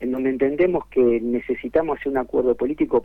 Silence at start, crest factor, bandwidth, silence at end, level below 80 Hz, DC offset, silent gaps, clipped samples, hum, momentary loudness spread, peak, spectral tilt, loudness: 0 s; 14 dB; 4 kHz; 0 s; -48 dBFS; under 0.1%; none; under 0.1%; none; 5 LU; -8 dBFS; -9 dB/octave; -21 LUFS